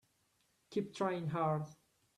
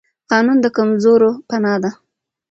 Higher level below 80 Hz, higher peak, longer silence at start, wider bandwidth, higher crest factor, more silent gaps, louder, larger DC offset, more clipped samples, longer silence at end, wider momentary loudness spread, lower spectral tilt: second, -78 dBFS vs -60 dBFS; second, -22 dBFS vs 0 dBFS; first, 0.7 s vs 0.3 s; first, 12 kHz vs 7.6 kHz; about the same, 18 dB vs 16 dB; neither; second, -38 LUFS vs -15 LUFS; neither; neither; about the same, 0.45 s vs 0.55 s; about the same, 6 LU vs 8 LU; about the same, -7 dB/octave vs -6.5 dB/octave